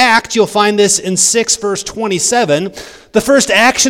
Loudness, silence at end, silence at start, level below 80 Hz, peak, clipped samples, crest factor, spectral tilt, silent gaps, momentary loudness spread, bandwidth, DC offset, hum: -11 LUFS; 0 s; 0 s; -46 dBFS; 0 dBFS; 0.4%; 12 dB; -2 dB/octave; none; 8 LU; 19.5 kHz; under 0.1%; none